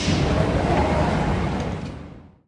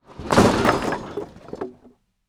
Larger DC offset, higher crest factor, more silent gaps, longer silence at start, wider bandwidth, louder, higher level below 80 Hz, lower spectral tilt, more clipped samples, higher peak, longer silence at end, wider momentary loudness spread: neither; about the same, 16 dB vs 20 dB; neither; about the same, 0 s vs 0.1 s; second, 11 kHz vs over 20 kHz; second, -22 LUFS vs -19 LUFS; first, -32 dBFS vs -42 dBFS; about the same, -6.5 dB/octave vs -5.5 dB/octave; neither; second, -6 dBFS vs -2 dBFS; second, 0.2 s vs 0.55 s; second, 15 LU vs 18 LU